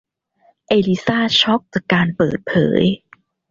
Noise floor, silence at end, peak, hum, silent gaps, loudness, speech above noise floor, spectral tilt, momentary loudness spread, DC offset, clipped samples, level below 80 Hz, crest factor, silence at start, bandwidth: -58 dBFS; 0.55 s; -2 dBFS; none; none; -17 LUFS; 42 dB; -6 dB/octave; 5 LU; under 0.1%; under 0.1%; -50 dBFS; 16 dB; 0.7 s; 7.4 kHz